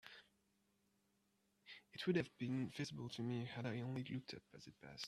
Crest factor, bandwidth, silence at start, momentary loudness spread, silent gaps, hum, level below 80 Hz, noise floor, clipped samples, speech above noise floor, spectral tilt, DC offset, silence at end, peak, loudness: 22 dB; 13 kHz; 0.05 s; 19 LU; none; none; -80 dBFS; -82 dBFS; under 0.1%; 37 dB; -6 dB/octave; under 0.1%; 0 s; -26 dBFS; -46 LUFS